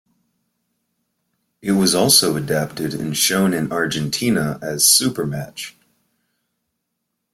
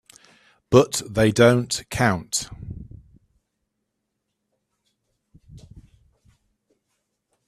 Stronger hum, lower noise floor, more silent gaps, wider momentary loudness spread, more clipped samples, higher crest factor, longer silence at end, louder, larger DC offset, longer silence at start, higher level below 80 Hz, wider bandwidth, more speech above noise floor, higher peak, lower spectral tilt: neither; about the same, -76 dBFS vs -78 dBFS; neither; second, 15 LU vs 21 LU; neither; about the same, 20 dB vs 24 dB; second, 1.65 s vs 1.9 s; first, -17 LUFS vs -20 LUFS; neither; first, 1.65 s vs 0.7 s; second, -56 dBFS vs -50 dBFS; first, 16.5 kHz vs 14 kHz; about the same, 58 dB vs 59 dB; about the same, 0 dBFS vs 0 dBFS; second, -3 dB/octave vs -5 dB/octave